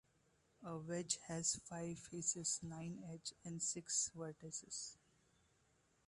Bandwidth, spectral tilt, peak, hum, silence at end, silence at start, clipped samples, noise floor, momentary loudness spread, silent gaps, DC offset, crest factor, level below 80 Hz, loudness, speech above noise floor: 11.5 kHz; -3 dB/octave; -24 dBFS; none; 1.15 s; 0.6 s; under 0.1%; -78 dBFS; 11 LU; none; under 0.1%; 24 dB; -78 dBFS; -44 LUFS; 32 dB